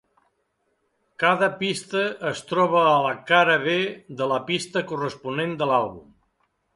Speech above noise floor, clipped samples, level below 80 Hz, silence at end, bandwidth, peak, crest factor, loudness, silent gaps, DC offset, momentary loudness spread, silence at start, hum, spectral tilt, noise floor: 49 dB; under 0.1%; -66 dBFS; 0.75 s; 11.5 kHz; -4 dBFS; 20 dB; -22 LUFS; none; under 0.1%; 11 LU; 1.2 s; none; -4.5 dB/octave; -72 dBFS